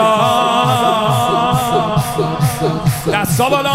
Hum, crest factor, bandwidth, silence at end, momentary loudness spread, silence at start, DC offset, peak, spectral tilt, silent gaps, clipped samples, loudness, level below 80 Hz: none; 14 dB; 16 kHz; 0 s; 4 LU; 0 s; under 0.1%; 0 dBFS; -5 dB/octave; none; under 0.1%; -14 LUFS; -40 dBFS